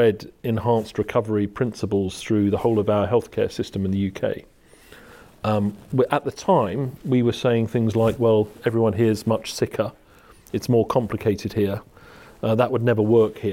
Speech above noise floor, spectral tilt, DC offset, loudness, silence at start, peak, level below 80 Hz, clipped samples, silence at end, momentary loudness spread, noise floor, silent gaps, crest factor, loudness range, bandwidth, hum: 29 dB; -7 dB/octave; under 0.1%; -22 LUFS; 0 s; -4 dBFS; -54 dBFS; under 0.1%; 0 s; 7 LU; -50 dBFS; none; 18 dB; 4 LU; 16.5 kHz; none